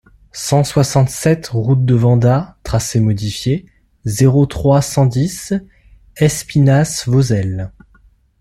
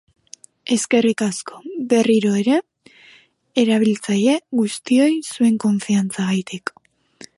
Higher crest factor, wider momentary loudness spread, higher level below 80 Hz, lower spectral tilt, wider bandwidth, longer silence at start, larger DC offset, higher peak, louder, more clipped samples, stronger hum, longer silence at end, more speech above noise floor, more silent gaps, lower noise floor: about the same, 14 dB vs 16 dB; second, 10 LU vs 13 LU; first, -38 dBFS vs -68 dBFS; about the same, -6 dB/octave vs -5 dB/octave; first, 13.5 kHz vs 11.5 kHz; second, 0.35 s vs 0.65 s; neither; about the same, -2 dBFS vs -4 dBFS; first, -15 LUFS vs -19 LUFS; neither; neither; first, 0.7 s vs 0.1 s; about the same, 37 dB vs 34 dB; neither; about the same, -50 dBFS vs -51 dBFS